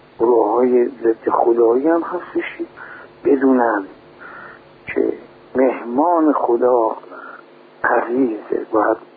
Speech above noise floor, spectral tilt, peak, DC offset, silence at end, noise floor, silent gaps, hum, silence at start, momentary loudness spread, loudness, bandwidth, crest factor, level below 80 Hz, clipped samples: 26 dB; -10 dB/octave; -2 dBFS; under 0.1%; 0.1 s; -42 dBFS; none; none; 0.2 s; 21 LU; -17 LUFS; 4.6 kHz; 16 dB; -62 dBFS; under 0.1%